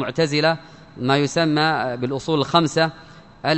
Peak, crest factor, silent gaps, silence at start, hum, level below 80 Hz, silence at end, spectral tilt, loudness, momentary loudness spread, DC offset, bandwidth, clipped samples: 0 dBFS; 20 dB; none; 0 s; none; -56 dBFS; 0 s; -5 dB/octave; -20 LUFS; 8 LU; 0.1%; 8.4 kHz; under 0.1%